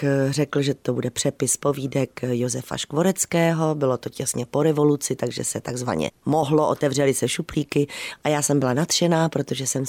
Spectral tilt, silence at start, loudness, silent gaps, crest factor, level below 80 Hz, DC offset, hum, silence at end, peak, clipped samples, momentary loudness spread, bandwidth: -4.5 dB/octave; 0 s; -23 LUFS; none; 14 dB; -56 dBFS; under 0.1%; none; 0 s; -8 dBFS; under 0.1%; 6 LU; 17.5 kHz